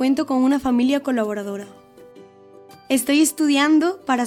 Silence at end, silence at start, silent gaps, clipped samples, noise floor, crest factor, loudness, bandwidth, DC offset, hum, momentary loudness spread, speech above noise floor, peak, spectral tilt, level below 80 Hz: 0 s; 0 s; none; under 0.1%; -46 dBFS; 14 dB; -19 LUFS; 17 kHz; under 0.1%; none; 10 LU; 27 dB; -6 dBFS; -3 dB/octave; -58 dBFS